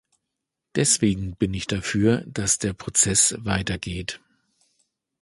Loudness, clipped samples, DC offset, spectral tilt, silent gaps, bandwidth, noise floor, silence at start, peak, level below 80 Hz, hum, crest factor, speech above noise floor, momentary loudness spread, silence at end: -22 LUFS; under 0.1%; under 0.1%; -3.5 dB/octave; none; 12 kHz; -83 dBFS; 0.75 s; -4 dBFS; -44 dBFS; none; 22 dB; 59 dB; 12 LU; 1.05 s